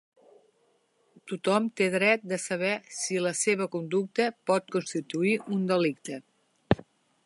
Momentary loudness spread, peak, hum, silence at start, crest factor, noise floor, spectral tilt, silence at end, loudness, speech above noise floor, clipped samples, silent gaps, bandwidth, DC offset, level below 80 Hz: 7 LU; -4 dBFS; none; 1.25 s; 24 dB; -69 dBFS; -4.5 dB/octave; 0.5 s; -28 LUFS; 41 dB; under 0.1%; none; 11.5 kHz; under 0.1%; -58 dBFS